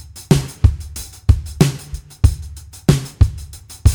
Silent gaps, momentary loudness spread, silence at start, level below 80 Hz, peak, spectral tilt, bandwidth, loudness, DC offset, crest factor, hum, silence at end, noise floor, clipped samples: none; 16 LU; 0.15 s; -22 dBFS; 0 dBFS; -6 dB/octave; over 20 kHz; -18 LUFS; under 0.1%; 16 dB; none; 0 s; -34 dBFS; under 0.1%